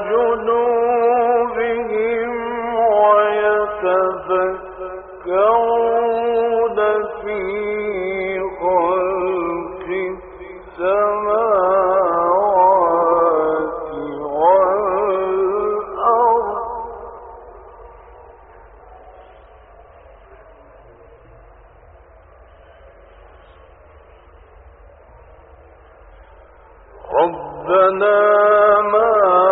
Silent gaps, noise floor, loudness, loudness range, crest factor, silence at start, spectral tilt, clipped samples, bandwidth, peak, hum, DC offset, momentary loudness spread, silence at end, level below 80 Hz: none; -45 dBFS; -17 LUFS; 6 LU; 16 dB; 0 s; -3.5 dB/octave; under 0.1%; 4.1 kHz; -2 dBFS; none; under 0.1%; 13 LU; 0 s; -48 dBFS